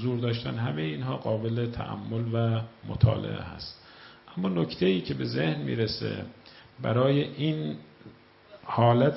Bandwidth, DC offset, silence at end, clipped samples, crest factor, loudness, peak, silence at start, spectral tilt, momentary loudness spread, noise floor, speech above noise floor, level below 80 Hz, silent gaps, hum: 5.8 kHz; under 0.1%; 0 s; under 0.1%; 22 dB; -29 LUFS; -6 dBFS; 0 s; -11 dB/octave; 16 LU; -53 dBFS; 26 dB; -52 dBFS; none; none